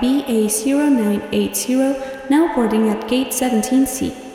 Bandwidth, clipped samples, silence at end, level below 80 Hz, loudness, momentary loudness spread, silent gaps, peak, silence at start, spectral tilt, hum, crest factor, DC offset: 17 kHz; under 0.1%; 0 s; -48 dBFS; -18 LUFS; 4 LU; none; -4 dBFS; 0 s; -4.5 dB/octave; none; 12 dB; under 0.1%